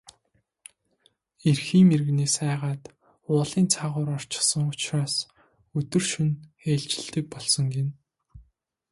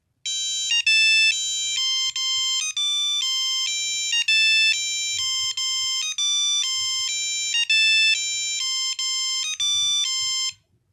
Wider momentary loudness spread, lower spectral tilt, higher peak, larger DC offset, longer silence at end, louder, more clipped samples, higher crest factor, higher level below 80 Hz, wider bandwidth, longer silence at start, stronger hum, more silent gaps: first, 12 LU vs 7 LU; first, -4.5 dB/octave vs 6.5 dB/octave; first, -6 dBFS vs -10 dBFS; neither; about the same, 0.5 s vs 0.4 s; second, -25 LUFS vs -19 LUFS; neither; first, 20 dB vs 14 dB; first, -62 dBFS vs -74 dBFS; second, 11.5 kHz vs 16.5 kHz; first, 1.45 s vs 0.25 s; neither; neither